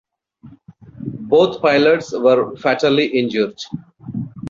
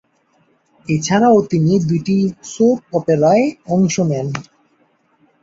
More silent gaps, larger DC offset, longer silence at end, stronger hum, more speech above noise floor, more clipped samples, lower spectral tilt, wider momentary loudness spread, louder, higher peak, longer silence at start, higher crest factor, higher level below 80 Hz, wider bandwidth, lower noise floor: neither; neither; second, 0 s vs 1 s; neither; second, 29 dB vs 44 dB; neither; about the same, -6 dB/octave vs -6.5 dB/octave; first, 16 LU vs 9 LU; about the same, -16 LUFS vs -16 LUFS; about the same, -2 dBFS vs -2 dBFS; second, 0.45 s vs 0.9 s; about the same, 16 dB vs 14 dB; about the same, -56 dBFS vs -54 dBFS; about the same, 7.6 kHz vs 7.8 kHz; second, -45 dBFS vs -59 dBFS